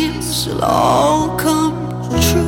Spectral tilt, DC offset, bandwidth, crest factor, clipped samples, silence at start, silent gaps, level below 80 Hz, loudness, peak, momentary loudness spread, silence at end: -4.5 dB/octave; under 0.1%; 17.5 kHz; 14 dB; under 0.1%; 0 s; none; -30 dBFS; -16 LUFS; 0 dBFS; 7 LU; 0 s